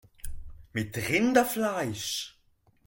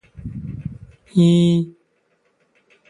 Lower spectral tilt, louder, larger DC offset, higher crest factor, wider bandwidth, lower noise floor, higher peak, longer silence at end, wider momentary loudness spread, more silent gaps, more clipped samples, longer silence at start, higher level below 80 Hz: second, -4 dB/octave vs -8 dB/octave; second, -28 LUFS vs -17 LUFS; neither; about the same, 22 dB vs 18 dB; first, 17 kHz vs 10.5 kHz; about the same, -66 dBFS vs -65 dBFS; second, -8 dBFS vs -4 dBFS; second, 0.6 s vs 1.2 s; about the same, 21 LU vs 20 LU; neither; neither; about the same, 0.25 s vs 0.2 s; about the same, -48 dBFS vs -48 dBFS